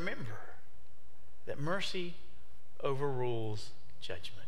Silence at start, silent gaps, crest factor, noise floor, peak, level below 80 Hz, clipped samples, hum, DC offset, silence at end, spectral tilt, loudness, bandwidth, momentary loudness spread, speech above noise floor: 0 s; none; 20 dB; -64 dBFS; -18 dBFS; -66 dBFS; under 0.1%; none; 3%; 0 s; -5.5 dB/octave; -39 LUFS; 16 kHz; 17 LU; 26 dB